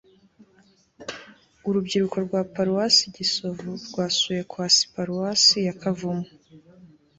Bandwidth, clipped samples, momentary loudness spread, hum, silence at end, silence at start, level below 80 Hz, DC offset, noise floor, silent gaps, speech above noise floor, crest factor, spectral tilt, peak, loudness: 8.2 kHz; under 0.1%; 19 LU; none; 0.35 s; 1 s; -64 dBFS; under 0.1%; -59 dBFS; none; 36 dB; 20 dB; -3 dB/octave; -4 dBFS; -22 LUFS